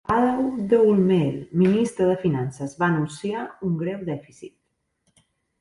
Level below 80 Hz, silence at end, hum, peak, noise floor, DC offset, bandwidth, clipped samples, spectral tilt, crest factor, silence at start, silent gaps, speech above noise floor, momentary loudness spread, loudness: -56 dBFS; 1.15 s; none; -6 dBFS; -73 dBFS; under 0.1%; 11.5 kHz; under 0.1%; -7.5 dB/octave; 16 dB; 0.1 s; none; 51 dB; 11 LU; -22 LUFS